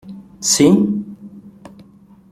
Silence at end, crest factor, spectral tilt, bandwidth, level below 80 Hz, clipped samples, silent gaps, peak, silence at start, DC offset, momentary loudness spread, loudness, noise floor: 0.8 s; 18 dB; -4 dB/octave; 15.5 kHz; -52 dBFS; under 0.1%; none; -2 dBFS; 0.05 s; under 0.1%; 25 LU; -15 LUFS; -46 dBFS